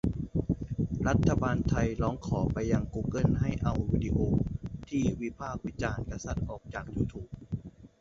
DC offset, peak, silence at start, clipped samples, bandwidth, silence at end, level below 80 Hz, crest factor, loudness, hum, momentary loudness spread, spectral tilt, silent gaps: under 0.1%; -12 dBFS; 0.05 s; under 0.1%; 7.6 kHz; 0.15 s; -40 dBFS; 18 dB; -31 LUFS; none; 11 LU; -7.5 dB/octave; none